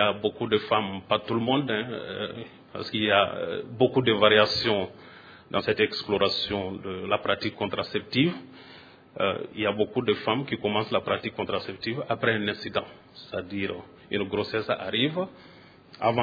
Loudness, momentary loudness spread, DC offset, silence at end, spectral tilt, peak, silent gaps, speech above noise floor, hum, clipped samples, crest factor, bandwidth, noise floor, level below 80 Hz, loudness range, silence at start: -27 LUFS; 13 LU; under 0.1%; 0 s; -6.5 dB/octave; -4 dBFS; none; 19 dB; none; under 0.1%; 24 dB; 5 kHz; -46 dBFS; -62 dBFS; 6 LU; 0 s